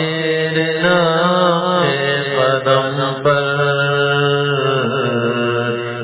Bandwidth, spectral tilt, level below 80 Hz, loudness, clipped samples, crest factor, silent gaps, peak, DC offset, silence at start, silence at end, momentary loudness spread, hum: 4 kHz; -9.5 dB/octave; -58 dBFS; -15 LUFS; under 0.1%; 16 dB; none; 0 dBFS; under 0.1%; 0 s; 0 s; 4 LU; none